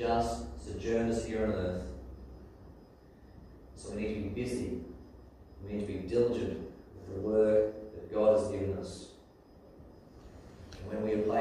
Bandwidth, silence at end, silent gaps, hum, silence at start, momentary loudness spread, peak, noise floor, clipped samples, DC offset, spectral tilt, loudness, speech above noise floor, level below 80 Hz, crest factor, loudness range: 12.5 kHz; 0 s; none; none; 0 s; 26 LU; -14 dBFS; -57 dBFS; under 0.1%; under 0.1%; -6.5 dB/octave; -33 LUFS; 25 dB; -50 dBFS; 20 dB; 10 LU